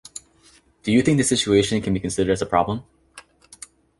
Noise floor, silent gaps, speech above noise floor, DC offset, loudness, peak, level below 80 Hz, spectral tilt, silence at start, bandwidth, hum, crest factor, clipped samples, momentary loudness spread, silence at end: -55 dBFS; none; 36 dB; under 0.1%; -21 LUFS; -4 dBFS; -46 dBFS; -4.5 dB/octave; 0.85 s; 11.5 kHz; none; 20 dB; under 0.1%; 22 LU; 0.8 s